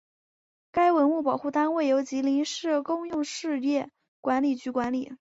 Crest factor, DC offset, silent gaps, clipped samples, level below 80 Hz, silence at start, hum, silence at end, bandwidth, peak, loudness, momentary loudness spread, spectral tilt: 14 dB; under 0.1%; 4.08-4.23 s; under 0.1%; -66 dBFS; 0.75 s; none; 0.05 s; 8 kHz; -12 dBFS; -27 LUFS; 7 LU; -4 dB/octave